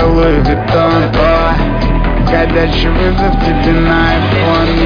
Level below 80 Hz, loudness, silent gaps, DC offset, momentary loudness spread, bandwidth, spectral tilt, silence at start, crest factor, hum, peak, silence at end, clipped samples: -16 dBFS; -11 LUFS; none; under 0.1%; 3 LU; 5.2 kHz; -8 dB/octave; 0 s; 10 dB; none; 0 dBFS; 0 s; under 0.1%